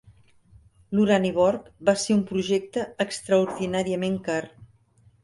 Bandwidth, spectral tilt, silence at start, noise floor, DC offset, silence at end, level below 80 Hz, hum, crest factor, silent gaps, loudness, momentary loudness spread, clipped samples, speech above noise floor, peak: 11.5 kHz; -5.5 dB/octave; 0.9 s; -59 dBFS; under 0.1%; 0.6 s; -60 dBFS; none; 18 dB; none; -24 LUFS; 8 LU; under 0.1%; 35 dB; -6 dBFS